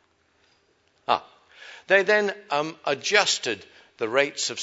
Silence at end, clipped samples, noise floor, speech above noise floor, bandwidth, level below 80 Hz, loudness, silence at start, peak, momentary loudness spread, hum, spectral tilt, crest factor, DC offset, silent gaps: 0 s; under 0.1%; -65 dBFS; 41 dB; 8 kHz; -78 dBFS; -23 LUFS; 1.1 s; -2 dBFS; 15 LU; none; -1.5 dB/octave; 24 dB; under 0.1%; none